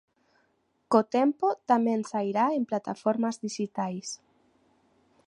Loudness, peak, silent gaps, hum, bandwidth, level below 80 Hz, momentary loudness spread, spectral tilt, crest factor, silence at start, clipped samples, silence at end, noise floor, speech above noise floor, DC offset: -28 LUFS; -6 dBFS; none; none; 10.5 kHz; -80 dBFS; 9 LU; -5.5 dB/octave; 22 dB; 0.9 s; under 0.1%; 1.15 s; -72 dBFS; 45 dB; under 0.1%